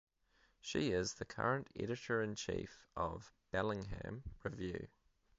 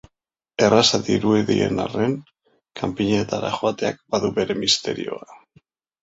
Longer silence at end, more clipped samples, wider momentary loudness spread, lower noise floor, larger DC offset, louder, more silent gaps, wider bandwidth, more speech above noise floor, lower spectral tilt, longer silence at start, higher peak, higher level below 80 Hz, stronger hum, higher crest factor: second, 0.5 s vs 0.65 s; neither; about the same, 11 LU vs 13 LU; second, -75 dBFS vs -81 dBFS; neither; second, -42 LUFS vs -21 LUFS; neither; second, 7.6 kHz vs 8.4 kHz; second, 34 dB vs 60 dB; about the same, -4.5 dB/octave vs -4.5 dB/octave; about the same, 0.65 s vs 0.6 s; second, -22 dBFS vs -2 dBFS; second, -60 dBFS vs -54 dBFS; neither; about the same, 20 dB vs 20 dB